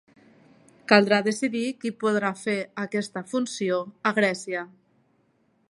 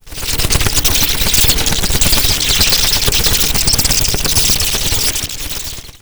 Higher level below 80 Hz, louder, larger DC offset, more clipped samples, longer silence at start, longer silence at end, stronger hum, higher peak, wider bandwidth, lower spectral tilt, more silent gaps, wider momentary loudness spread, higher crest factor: second, -76 dBFS vs -22 dBFS; second, -25 LUFS vs -11 LUFS; neither; neither; first, 0.9 s vs 0.05 s; first, 1.05 s vs 0.05 s; neither; about the same, -2 dBFS vs 0 dBFS; second, 11.5 kHz vs over 20 kHz; first, -4.5 dB/octave vs -1.5 dB/octave; neither; about the same, 11 LU vs 9 LU; first, 24 dB vs 14 dB